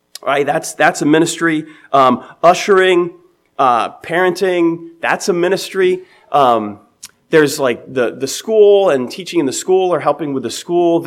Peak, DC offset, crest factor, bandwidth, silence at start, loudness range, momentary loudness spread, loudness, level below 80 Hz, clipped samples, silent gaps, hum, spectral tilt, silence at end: 0 dBFS; under 0.1%; 14 dB; 16 kHz; 0.25 s; 2 LU; 9 LU; -14 LUFS; -66 dBFS; under 0.1%; none; none; -4.5 dB/octave; 0 s